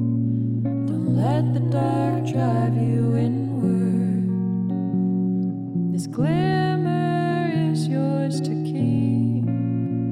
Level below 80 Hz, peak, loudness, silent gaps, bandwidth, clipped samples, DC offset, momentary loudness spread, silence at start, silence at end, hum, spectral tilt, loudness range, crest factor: -56 dBFS; -12 dBFS; -22 LUFS; none; 11 kHz; under 0.1%; under 0.1%; 3 LU; 0 s; 0 s; none; -8.5 dB/octave; 1 LU; 10 dB